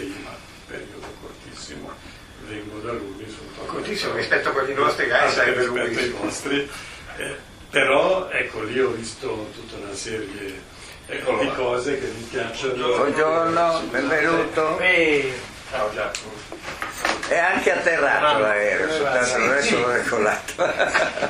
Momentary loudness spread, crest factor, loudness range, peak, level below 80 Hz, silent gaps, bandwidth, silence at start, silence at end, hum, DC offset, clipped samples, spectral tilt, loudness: 18 LU; 20 dB; 8 LU; -4 dBFS; -50 dBFS; none; 15.5 kHz; 0 s; 0 s; none; under 0.1%; under 0.1%; -3.5 dB/octave; -21 LUFS